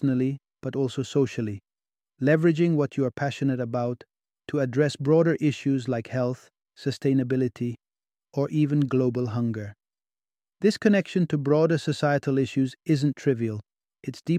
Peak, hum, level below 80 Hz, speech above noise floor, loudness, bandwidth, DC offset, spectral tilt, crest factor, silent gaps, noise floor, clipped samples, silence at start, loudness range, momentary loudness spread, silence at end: -6 dBFS; none; -66 dBFS; over 66 dB; -25 LUFS; 10.5 kHz; under 0.1%; -7.5 dB/octave; 18 dB; none; under -90 dBFS; under 0.1%; 0 s; 3 LU; 12 LU; 0 s